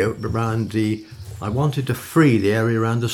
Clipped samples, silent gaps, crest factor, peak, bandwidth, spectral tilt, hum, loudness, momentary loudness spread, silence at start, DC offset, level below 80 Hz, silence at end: under 0.1%; none; 16 dB; -4 dBFS; 17.5 kHz; -7 dB/octave; none; -20 LUFS; 11 LU; 0 s; under 0.1%; -48 dBFS; 0 s